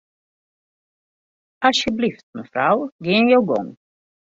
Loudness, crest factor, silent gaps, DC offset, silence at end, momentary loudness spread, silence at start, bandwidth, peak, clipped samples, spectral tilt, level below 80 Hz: -19 LUFS; 20 dB; 2.23-2.33 s, 2.92-2.99 s; under 0.1%; 0.65 s; 12 LU; 1.6 s; 7.8 kHz; -2 dBFS; under 0.1%; -4.5 dB/octave; -58 dBFS